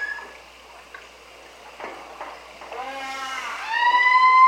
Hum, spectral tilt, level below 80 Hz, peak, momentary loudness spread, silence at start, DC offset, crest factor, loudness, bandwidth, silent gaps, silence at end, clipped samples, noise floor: none; 0 dB/octave; -62 dBFS; -6 dBFS; 28 LU; 0 s; under 0.1%; 18 dB; -21 LUFS; 14 kHz; none; 0 s; under 0.1%; -46 dBFS